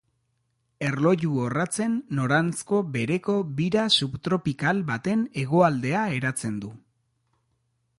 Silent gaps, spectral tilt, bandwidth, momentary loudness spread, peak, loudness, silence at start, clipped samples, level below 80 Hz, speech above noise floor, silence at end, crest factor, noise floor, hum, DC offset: none; -5 dB/octave; 11.5 kHz; 7 LU; -6 dBFS; -25 LUFS; 0.8 s; under 0.1%; -60 dBFS; 49 dB; 1.2 s; 18 dB; -73 dBFS; none; under 0.1%